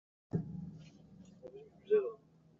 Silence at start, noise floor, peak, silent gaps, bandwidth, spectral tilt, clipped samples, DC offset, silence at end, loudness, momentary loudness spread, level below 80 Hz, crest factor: 0.35 s; -58 dBFS; -20 dBFS; none; 7 kHz; -8.5 dB/octave; under 0.1%; under 0.1%; 0.45 s; -37 LUFS; 24 LU; -72 dBFS; 20 dB